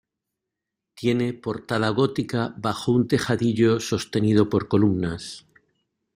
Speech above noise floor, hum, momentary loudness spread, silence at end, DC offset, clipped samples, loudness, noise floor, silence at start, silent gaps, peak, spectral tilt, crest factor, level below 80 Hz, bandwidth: 62 dB; none; 8 LU; 0.75 s; under 0.1%; under 0.1%; -23 LUFS; -84 dBFS; 0.95 s; none; -6 dBFS; -6.5 dB/octave; 18 dB; -56 dBFS; 15.5 kHz